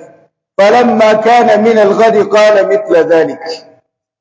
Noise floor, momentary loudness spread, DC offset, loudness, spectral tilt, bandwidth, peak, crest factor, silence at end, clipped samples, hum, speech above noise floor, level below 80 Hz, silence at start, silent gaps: -50 dBFS; 13 LU; under 0.1%; -8 LUFS; -5 dB/octave; 8 kHz; 0 dBFS; 10 dB; 0.6 s; 2%; none; 43 dB; -60 dBFS; 0.6 s; none